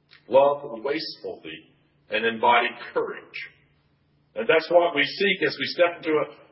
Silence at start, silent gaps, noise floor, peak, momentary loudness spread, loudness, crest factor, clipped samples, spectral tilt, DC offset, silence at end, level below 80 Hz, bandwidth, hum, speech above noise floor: 0.3 s; none; -65 dBFS; -6 dBFS; 17 LU; -23 LUFS; 20 dB; under 0.1%; -8 dB/octave; under 0.1%; 0.2 s; -74 dBFS; 5.8 kHz; none; 41 dB